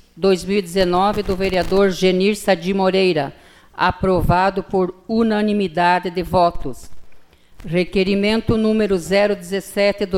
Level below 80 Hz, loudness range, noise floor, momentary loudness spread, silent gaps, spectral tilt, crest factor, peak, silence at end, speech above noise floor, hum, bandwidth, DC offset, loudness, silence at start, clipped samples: -36 dBFS; 2 LU; -41 dBFS; 5 LU; none; -6 dB/octave; 14 dB; -4 dBFS; 0 s; 23 dB; none; 15.5 kHz; under 0.1%; -18 LUFS; 0.15 s; under 0.1%